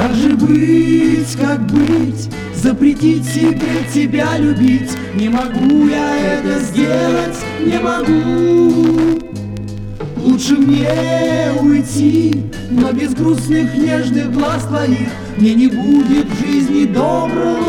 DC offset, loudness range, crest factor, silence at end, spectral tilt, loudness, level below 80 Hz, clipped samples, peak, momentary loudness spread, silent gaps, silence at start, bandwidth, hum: under 0.1%; 1 LU; 12 dB; 0 s; -6.5 dB/octave; -14 LUFS; -36 dBFS; under 0.1%; 0 dBFS; 7 LU; none; 0 s; 14 kHz; none